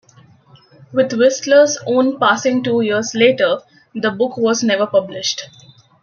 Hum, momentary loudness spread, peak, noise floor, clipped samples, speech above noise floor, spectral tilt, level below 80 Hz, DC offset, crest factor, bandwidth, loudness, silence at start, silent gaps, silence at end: none; 10 LU; -2 dBFS; -48 dBFS; under 0.1%; 33 dB; -3.5 dB/octave; -66 dBFS; under 0.1%; 14 dB; 7.2 kHz; -16 LUFS; 0.9 s; none; 0.55 s